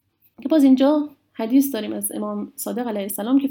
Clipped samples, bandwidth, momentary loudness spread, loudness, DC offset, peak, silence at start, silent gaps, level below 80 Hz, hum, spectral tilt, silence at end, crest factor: under 0.1%; 19 kHz; 13 LU; -21 LUFS; under 0.1%; -6 dBFS; 0.4 s; none; -74 dBFS; none; -5 dB/octave; 0 s; 14 dB